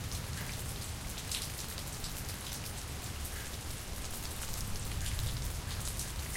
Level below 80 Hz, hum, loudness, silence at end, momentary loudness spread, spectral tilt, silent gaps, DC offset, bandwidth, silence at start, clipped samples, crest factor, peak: -44 dBFS; none; -39 LUFS; 0 s; 4 LU; -3 dB/octave; none; under 0.1%; 17 kHz; 0 s; under 0.1%; 22 dB; -18 dBFS